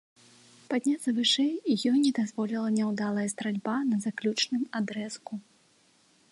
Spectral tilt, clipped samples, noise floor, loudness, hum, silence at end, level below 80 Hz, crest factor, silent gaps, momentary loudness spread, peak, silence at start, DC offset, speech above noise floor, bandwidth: -4 dB/octave; under 0.1%; -64 dBFS; -28 LUFS; none; 0.9 s; -80 dBFS; 16 dB; none; 9 LU; -14 dBFS; 0.7 s; under 0.1%; 36 dB; 11.5 kHz